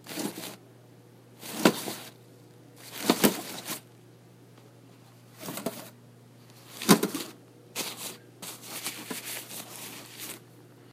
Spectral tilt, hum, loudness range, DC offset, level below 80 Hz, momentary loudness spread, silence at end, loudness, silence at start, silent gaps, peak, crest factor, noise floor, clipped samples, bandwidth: -3.5 dB/octave; none; 8 LU; under 0.1%; -72 dBFS; 21 LU; 0 s; -31 LUFS; 0 s; none; -2 dBFS; 32 dB; -54 dBFS; under 0.1%; 16 kHz